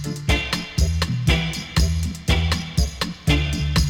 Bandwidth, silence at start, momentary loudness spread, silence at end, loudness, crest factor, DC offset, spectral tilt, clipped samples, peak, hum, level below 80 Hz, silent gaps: 18.5 kHz; 0 s; 4 LU; 0 s; -22 LUFS; 14 dB; under 0.1%; -4.5 dB/octave; under 0.1%; -8 dBFS; none; -26 dBFS; none